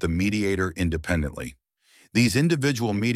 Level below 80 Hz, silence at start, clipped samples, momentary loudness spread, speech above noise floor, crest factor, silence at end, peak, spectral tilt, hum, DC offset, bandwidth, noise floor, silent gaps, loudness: -40 dBFS; 0 s; under 0.1%; 9 LU; 36 dB; 14 dB; 0 s; -10 dBFS; -5.5 dB/octave; none; under 0.1%; 16 kHz; -59 dBFS; none; -24 LUFS